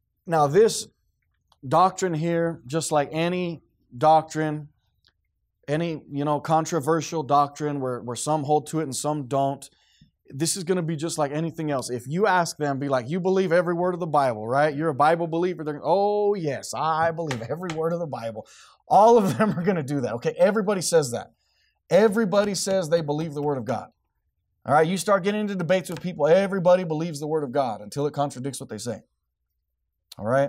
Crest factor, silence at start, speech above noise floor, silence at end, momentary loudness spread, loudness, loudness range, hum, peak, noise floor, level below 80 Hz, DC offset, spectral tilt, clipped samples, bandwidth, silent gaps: 16 dB; 0.25 s; 55 dB; 0 s; 10 LU; -24 LUFS; 4 LU; none; -6 dBFS; -78 dBFS; -66 dBFS; under 0.1%; -5.5 dB/octave; under 0.1%; 16 kHz; none